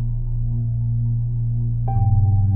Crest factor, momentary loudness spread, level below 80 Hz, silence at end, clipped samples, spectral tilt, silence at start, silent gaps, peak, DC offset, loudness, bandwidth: 12 dB; 7 LU; -26 dBFS; 0 s; under 0.1%; -15 dB/octave; 0 s; none; -6 dBFS; under 0.1%; -21 LUFS; 1 kHz